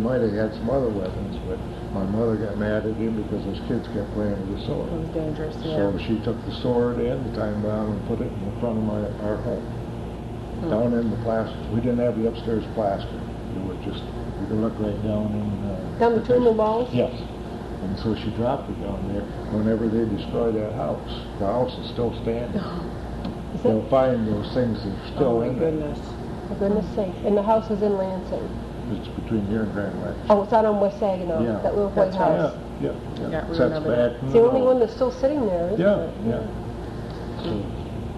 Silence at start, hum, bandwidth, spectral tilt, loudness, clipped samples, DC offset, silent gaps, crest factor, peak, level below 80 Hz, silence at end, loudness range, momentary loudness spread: 0 s; none; 12 kHz; -8.5 dB/octave; -25 LUFS; under 0.1%; under 0.1%; none; 20 dB; -4 dBFS; -38 dBFS; 0 s; 5 LU; 11 LU